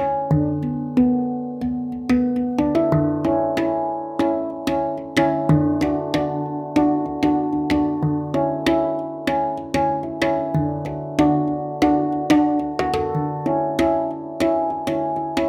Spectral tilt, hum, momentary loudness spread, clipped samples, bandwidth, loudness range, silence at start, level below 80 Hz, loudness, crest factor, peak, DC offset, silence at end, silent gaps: -7.5 dB/octave; none; 6 LU; under 0.1%; 13.5 kHz; 1 LU; 0 s; -46 dBFS; -21 LUFS; 16 dB; -4 dBFS; under 0.1%; 0 s; none